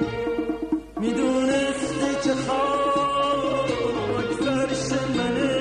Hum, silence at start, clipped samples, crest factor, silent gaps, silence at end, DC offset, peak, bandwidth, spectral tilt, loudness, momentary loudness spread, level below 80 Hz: none; 0 s; under 0.1%; 12 dB; none; 0 s; under 0.1%; -10 dBFS; 11 kHz; -5 dB/octave; -24 LUFS; 5 LU; -48 dBFS